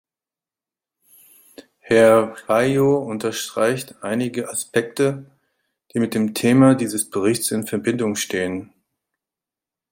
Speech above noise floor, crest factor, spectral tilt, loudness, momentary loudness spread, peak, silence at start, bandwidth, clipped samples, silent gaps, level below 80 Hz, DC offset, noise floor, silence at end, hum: over 71 dB; 18 dB; -5 dB/octave; -20 LUFS; 11 LU; -2 dBFS; 1.85 s; 16.5 kHz; under 0.1%; none; -62 dBFS; under 0.1%; under -90 dBFS; 1.25 s; none